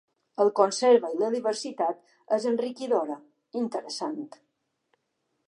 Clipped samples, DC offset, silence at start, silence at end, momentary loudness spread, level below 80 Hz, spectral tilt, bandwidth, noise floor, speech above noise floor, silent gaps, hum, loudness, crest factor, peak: under 0.1%; under 0.1%; 0.4 s; 1.2 s; 17 LU; -86 dBFS; -4 dB/octave; 11 kHz; -78 dBFS; 52 dB; none; none; -27 LUFS; 22 dB; -6 dBFS